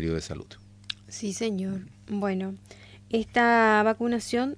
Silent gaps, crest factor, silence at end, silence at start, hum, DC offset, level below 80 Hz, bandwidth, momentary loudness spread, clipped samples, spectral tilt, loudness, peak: none; 18 dB; 0 s; 0 s; none; under 0.1%; -52 dBFS; 11 kHz; 18 LU; under 0.1%; -5 dB/octave; -26 LUFS; -10 dBFS